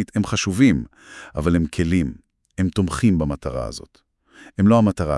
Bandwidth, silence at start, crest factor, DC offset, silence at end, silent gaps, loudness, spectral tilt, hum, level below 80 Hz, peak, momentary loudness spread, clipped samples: 12 kHz; 0 s; 18 dB; under 0.1%; 0 s; none; -20 LUFS; -6.5 dB/octave; none; -40 dBFS; -4 dBFS; 18 LU; under 0.1%